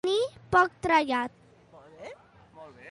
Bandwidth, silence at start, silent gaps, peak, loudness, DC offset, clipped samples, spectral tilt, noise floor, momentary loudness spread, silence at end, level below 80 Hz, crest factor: 11.5 kHz; 0.05 s; none; -10 dBFS; -26 LUFS; under 0.1%; under 0.1%; -4.5 dB/octave; -54 dBFS; 22 LU; 0 s; -58 dBFS; 20 dB